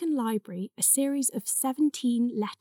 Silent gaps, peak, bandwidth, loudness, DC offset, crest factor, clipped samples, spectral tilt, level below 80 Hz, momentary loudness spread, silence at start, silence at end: none; -10 dBFS; 19.5 kHz; -26 LUFS; under 0.1%; 18 dB; under 0.1%; -3.5 dB/octave; under -90 dBFS; 8 LU; 0 s; 0.05 s